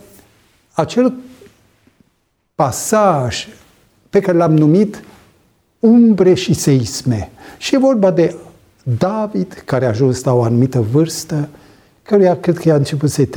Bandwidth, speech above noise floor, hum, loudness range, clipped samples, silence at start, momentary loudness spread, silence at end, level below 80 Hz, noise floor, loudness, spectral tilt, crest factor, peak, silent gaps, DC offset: 19.5 kHz; 51 dB; none; 5 LU; under 0.1%; 0.75 s; 13 LU; 0 s; -48 dBFS; -64 dBFS; -14 LUFS; -6.5 dB/octave; 14 dB; -2 dBFS; none; under 0.1%